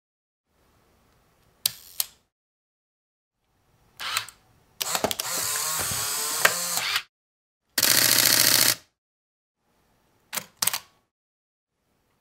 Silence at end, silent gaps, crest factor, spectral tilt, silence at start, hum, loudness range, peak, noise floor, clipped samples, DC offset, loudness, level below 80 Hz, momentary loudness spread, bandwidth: 1.4 s; 2.32-3.31 s, 7.09-7.61 s, 8.98-9.55 s; 28 dB; 0 dB/octave; 1.65 s; none; 14 LU; 0 dBFS; -71 dBFS; under 0.1%; under 0.1%; -23 LUFS; -64 dBFS; 15 LU; 16.5 kHz